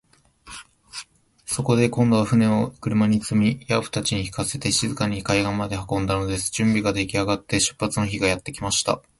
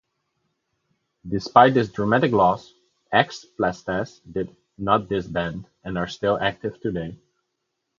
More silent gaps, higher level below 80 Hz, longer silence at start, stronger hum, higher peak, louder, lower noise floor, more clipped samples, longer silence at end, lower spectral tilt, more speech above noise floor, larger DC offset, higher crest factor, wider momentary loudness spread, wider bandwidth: neither; first, -46 dBFS vs -52 dBFS; second, 0.45 s vs 1.25 s; neither; second, -4 dBFS vs 0 dBFS; about the same, -22 LUFS vs -23 LUFS; second, -49 dBFS vs -78 dBFS; neither; second, 0.2 s vs 0.85 s; second, -4.5 dB/octave vs -6.5 dB/octave; second, 27 dB vs 56 dB; neither; second, 18 dB vs 24 dB; about the same, 15 LU vs 14 LU; first, 12 kHz vs 7.4 kHz